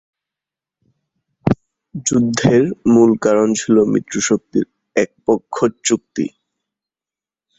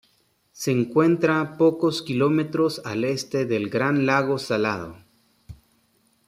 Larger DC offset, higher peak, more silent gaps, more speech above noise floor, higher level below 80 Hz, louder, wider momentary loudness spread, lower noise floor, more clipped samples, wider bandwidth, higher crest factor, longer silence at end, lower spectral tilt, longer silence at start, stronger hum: neither; first, -2 dBFS vs -6 dBFS; neither; first, over 75 dB vs 43 dB; first, -50 dBFS vs -62 dBFS; first, -17 LUFS vs -23 LUFS; first, 10 LU vs 6 LU; first, under -90 dBFS vs -65 dBFS; neither; second, 8.2 kHz vs 15.5 kHz; about the same, 16 dB vs 18 dB; first, 1.3 s vs 0.75 s; about the same, -5 dB/octave vs -6 dB/octave; first, 1.45 s vs 0.55 s; neither